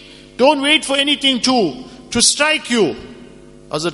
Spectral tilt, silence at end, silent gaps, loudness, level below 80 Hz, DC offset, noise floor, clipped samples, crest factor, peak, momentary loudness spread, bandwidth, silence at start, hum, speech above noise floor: -2 dB/octave; 0 s; none; -14 LUFS; -48 dBFS; under 0.1%; -40 dBFS; under 0.1%; 18 dB; 0 dBFS; 15 LU; 11.5 kHz; 0 s; none; 25 dB